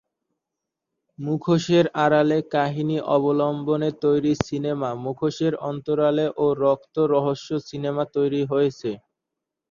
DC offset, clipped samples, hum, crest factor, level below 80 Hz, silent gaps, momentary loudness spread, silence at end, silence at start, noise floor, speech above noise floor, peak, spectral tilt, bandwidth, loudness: under 0.1%; under 0.1%; none; 20 dB; -58 dBFS; none; 9 LU; 0.7 s; 1.2 s; -84 dBFS; 62 dB; -2 dBFS; -7 dB/octave; 7.4 kHz; -23 LUFS